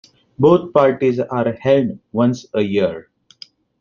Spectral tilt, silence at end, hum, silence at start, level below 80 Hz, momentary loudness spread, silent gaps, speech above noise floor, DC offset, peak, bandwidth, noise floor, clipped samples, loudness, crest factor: -8 dB/octave; 0.8 s; none; 0.4 s; -56 dBFS; 8 LU; none; 28 dB; under 0.1%; 0 dBFS; 7.2 kHz; -44 dBFS; under 0.1%; -17 LUFS; 16 dB